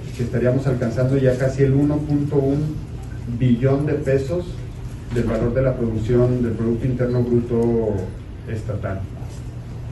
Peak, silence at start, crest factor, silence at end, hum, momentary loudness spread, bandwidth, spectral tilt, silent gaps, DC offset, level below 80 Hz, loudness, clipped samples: -4 dBFS; 0 s; 16 dB; 0 s; none; 14 LU; 12 kHz; -9 dB/octave; none; under 0.1%; -36 dBFS; -20 LUFS; under 0.1%